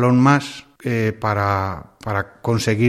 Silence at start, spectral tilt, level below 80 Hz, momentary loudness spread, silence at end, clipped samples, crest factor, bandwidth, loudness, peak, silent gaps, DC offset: 0 s; -6.5 dB/octave; -50 dBFS; 14 LU; 0 s; under 0.1%; 16 dB; 14.5 kHz; -20 LUFS; -2 dBFS; none; under 0.1%